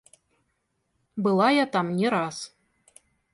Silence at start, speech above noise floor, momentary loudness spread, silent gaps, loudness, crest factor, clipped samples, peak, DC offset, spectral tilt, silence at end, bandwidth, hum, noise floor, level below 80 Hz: 1.15 s; 52 dB; 18 LU; none; -24 LUFS; 18 dB; under 0.1%; -10 dBFS; under 0.1%; -5.5 dB/octave; 0.85 s; 11.5 kHz; none; -75 dBFS; -72 dBFS